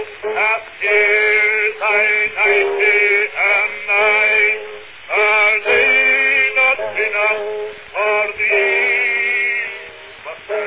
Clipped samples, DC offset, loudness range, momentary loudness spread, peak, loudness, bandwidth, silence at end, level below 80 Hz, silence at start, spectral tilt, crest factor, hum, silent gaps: under 0.1%; under 0.1%; 3 LU; 14 LU; -2 dBFS; -13 LUFS; 4 kHz; 0 s; -58 dBFS; 0 s; -4.5 dB/octave; 14 dB; none; none